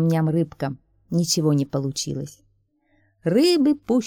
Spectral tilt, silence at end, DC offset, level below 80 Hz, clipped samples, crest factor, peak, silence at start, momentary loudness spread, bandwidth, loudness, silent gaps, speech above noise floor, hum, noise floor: -5.5 dB/octave; 0 s; under 0.1%; -58 dBFS; under 0.1%; 14 dB; -8 dBFS; 0 s; 13 LU; 18 kHz; -22 LUFS; none; 44 dB; none; -65 dBFS